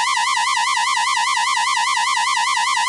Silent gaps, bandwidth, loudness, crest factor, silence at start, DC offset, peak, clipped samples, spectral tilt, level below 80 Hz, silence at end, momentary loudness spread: none; 11.5 kHz; -17 LUFS; 10 dB; 0 s; under 0.1%; -8 dBFS; under 0.1%; 3.5 dB/octave; -78 dBFS; 0 s; 0 LU